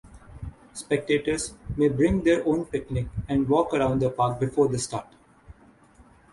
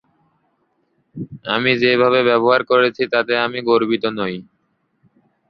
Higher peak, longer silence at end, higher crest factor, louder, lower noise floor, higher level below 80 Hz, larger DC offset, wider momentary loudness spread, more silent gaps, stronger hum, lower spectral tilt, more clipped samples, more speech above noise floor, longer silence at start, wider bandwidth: second, -8 dBFS vs -2 dBFS; second, 0.3 s vs 1.05 s; about the same, 16 dB vs 18 dB; second, -25 LUFS vs -16 LUFS; second, -55 dBFS vs -66 dBFS; first, -44 dBFS vs -62 dBFS; neither; about the same, 14 LU vs 14 LU; neither; neither; about the same, -6 dB/octave vs -7 dB/octave; neither; second, 30 dB vs 50 dB; second, 0.05 s vs 1.15 s; first, 11.5 kHz vs 6 kHz